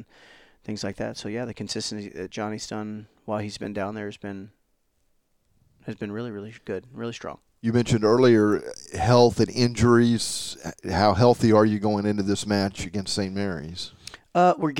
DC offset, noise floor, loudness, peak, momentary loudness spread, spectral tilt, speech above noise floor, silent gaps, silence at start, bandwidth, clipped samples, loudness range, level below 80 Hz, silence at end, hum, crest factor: under 0.1%; -69 dBFS; -24 LUFS; -4 dBFS; 18 LU; -5.5 dB/octave; 46 dB; none; 0 s; 16.5 kHz; under 0.1%; 15 LU; -50 dBFS; 0 s; none; 20 dB